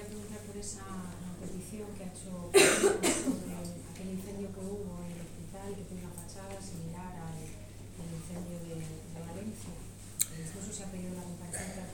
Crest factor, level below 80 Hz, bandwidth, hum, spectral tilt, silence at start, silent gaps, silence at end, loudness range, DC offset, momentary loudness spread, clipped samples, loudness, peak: 28 dB; -54 dBFS; 18 kHz; none; -3.5 dB/octave; 0 s; none; 0 s; 13 LU; under 0.1%; 17 LU; under 0.1%; -35 LUFS; -8 dBFS